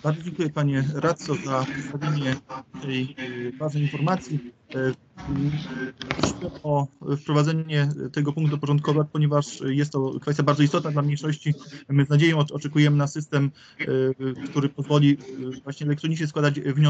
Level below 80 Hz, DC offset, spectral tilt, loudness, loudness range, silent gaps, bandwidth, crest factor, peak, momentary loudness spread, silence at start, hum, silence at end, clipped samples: -56 dBFS; under 0.1%; -7 dB/octave; -25 LUFS; 5 LU; none; 8 kHz; 20 dB; -4 dBFS; 11 LU; 0.05 s; none; 0 s; under 0.1%